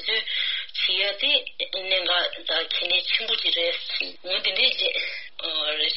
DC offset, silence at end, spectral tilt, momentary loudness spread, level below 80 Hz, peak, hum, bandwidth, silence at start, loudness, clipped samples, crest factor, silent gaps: 0.7%; 0 s; 4.5 dB/octave; 8 LU; -68 dBFS; -6 dBFS; none; 6 kHz; 0 s; -23 LUFS; under 0.1%; 18 dB; none